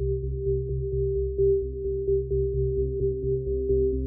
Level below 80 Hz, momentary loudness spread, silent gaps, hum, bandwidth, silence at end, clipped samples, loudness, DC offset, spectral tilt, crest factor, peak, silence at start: -32 dBFS; 5 LU; none; none; 0.6 kHz; 0 s; under 0.1%; -27 LUFS; under 0.1%; -18.5 dB/octave; 12 dB; -14 dBFS; 0 s